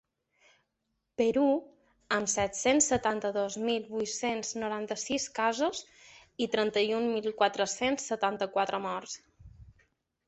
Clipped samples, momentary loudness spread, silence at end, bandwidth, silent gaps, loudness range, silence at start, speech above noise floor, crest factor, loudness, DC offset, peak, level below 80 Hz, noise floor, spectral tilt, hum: under 0.1%; 8 LU; 0.55 s; 8.4 kHz; none; 3 LU; 1.2 s; 51 dB; 20 dB; -30 LUFS; under 0.1%; -12 dBFS; -64 dBFS; -81 dBFS; -2.5 dB/octave; none